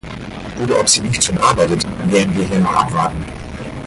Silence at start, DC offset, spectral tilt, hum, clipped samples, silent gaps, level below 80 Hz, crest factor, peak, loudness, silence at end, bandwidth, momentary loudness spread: 0.05 s; under 0.1%; -4 dB/octave; none; under 0.1%; none; -36 dBFS; 16 dB; 0 dBFS; -15 LUFS; 0 s; 11.5 kHz; 16 LU